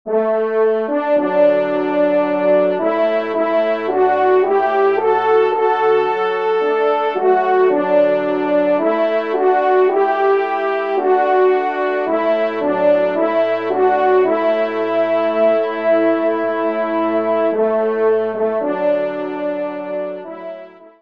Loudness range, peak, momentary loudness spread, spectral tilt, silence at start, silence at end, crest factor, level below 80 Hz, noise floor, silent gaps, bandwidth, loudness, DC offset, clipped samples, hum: 2 LU; -4 dBFS; 5 LU; -7.5 dB/octave; 0.05 s; 0.1 s; 12 dB; -72 dBFS; -36 dBFS; none; 5.6 kHz; -16 LUFS; 0.3%; under 0.1%; none